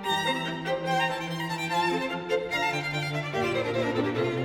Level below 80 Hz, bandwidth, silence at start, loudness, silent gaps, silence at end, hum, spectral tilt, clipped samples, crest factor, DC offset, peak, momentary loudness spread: -60 dBFS; 18 kHz; 0 s; -28 LUFS; none; 0 s; none; -5 dB/octave; under 0.1%; 14 dB; under 0.1%; -14 dBFS; 4 LU